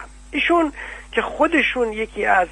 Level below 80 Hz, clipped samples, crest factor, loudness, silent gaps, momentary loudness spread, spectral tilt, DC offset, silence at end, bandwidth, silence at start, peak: -42 dBFS; under 0.1%; 18 dB; -20 LUFS; none; 8 LU; -4 dB/octave; under 0.1%; 0 s; 10.5 kHz; 0 s; -2 dBFS